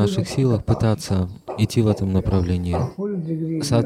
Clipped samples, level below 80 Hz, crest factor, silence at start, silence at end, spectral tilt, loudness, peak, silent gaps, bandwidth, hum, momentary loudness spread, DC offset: under 0.1%; -38 dBFS; 16 dB; 0 s; 0 s; -7 dB/octave; -22 LUFS; -4 dBFS; none; 14.5 kHz; none; 6 LU; under 0.1%